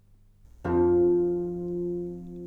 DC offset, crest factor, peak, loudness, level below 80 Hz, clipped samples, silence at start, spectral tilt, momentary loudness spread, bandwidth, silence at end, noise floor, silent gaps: under 0.1%; 12 dB; -14 dBFS; -26 LUFS; -50 dBFS; under 0.1%; 0.65 s; -11 dB/octave; 13 LU; 2.8 kHz; 0 s; -55 dBFS; none